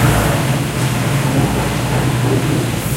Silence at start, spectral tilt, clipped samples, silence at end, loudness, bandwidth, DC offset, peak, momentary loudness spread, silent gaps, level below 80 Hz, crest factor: 0 s; -5.5 dB/octave; under 0.1%; 0 s; -16 LUFS; 16 kHz; under 0.1%; 0 dBFS; 2 LU; none; -30 dBFS; 14 dB